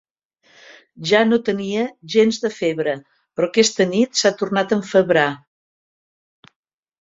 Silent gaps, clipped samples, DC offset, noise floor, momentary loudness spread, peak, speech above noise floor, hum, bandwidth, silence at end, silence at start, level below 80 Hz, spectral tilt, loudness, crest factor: none; under 0.1%; under 0.1%; -59 dBFS; 9 LU; -2 dBFS; 41 dB; none; 7.8 kHz; 1.65 s; 1 s; -64 dBFS; -4 dB/octave; -18 LUFS; 18 dB